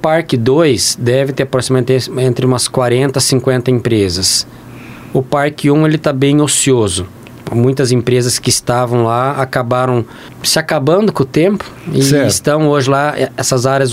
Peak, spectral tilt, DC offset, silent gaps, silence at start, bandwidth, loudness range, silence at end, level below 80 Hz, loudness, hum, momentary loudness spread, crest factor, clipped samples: 0 dBFS; -4.5 dB/octave; 0.1%; none; 0 s; 16 kHz; 1 LU; 0 s; -44 dBFS; -12 LUFS; none; 7 LU; 12 dB; under 0.1%